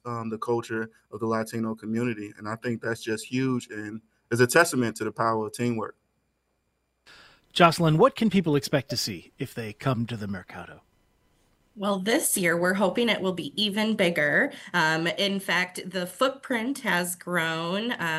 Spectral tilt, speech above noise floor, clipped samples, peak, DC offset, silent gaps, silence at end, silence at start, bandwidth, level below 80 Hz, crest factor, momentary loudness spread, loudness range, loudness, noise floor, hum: -4.5 dB/octave; 48 dB; under 0.1%; -2 dBFS; under 0.1%; none; 0 s; 0.05 s; 16 kHz; -64 dBFS; 24 dB; 14 LU; 6 LU; -26 LUFS; -74 dBFS; none